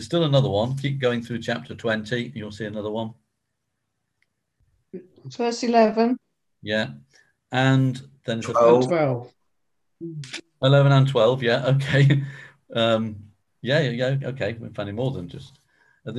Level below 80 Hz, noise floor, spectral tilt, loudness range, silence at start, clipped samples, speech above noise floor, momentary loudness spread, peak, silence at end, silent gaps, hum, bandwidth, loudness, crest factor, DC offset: -58 dBFS; -80 dBFS; -6.5 dB/octave; 10 LU; 0 s; under 0.1%; 58 dB; 19 LU; -4 dBFS; 0 s; none; none; 10.5 kHz; -22 LUFS; 20 dB; under 0.1%